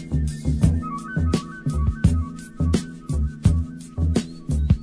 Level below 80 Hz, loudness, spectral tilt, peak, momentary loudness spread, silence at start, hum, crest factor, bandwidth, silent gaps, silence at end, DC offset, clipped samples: -28 dBFS; -24 LUFS; -7 dB/octave; -4 dBFS; 6 LU; 0 s; none; 18 dB; 11 kHz; none; 0 s; under 0.1%; under 0.1%